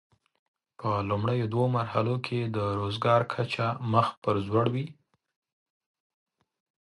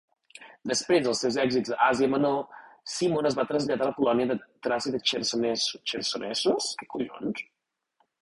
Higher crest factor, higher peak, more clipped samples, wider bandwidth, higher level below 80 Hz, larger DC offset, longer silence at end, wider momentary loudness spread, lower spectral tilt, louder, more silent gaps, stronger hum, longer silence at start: about the same, 22 dB vs 18 dB; about the same, -8 dBFS vs -8 dBFS; neither; about the same, 11.5 kHz vs 11.5 kHz; first, -58 dBFS vs -66 dBFS; neither; first, 1.95 s vs 0.8 s; second, 6 LU vs 10 LU; first, -8 dB/octave vs -3.5 dB/octave; about the same, -28 LUFS vs -27 LUFS; first, 4.17-4.22 s vs none; neither; first, 0.8 s vs 0.4 s